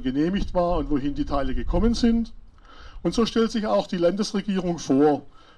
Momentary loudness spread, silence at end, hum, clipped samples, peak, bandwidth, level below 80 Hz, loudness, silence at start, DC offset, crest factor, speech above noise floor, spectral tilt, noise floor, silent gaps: 7 LU; 0.2 s; none; under 0.1%; -8 dBFS; 11 kHz; -34 dBFS; -24 LUFS; 0 s; under 0.1%; 16 dB; 22 dB; -6 dB/octave; -44 dBFS; none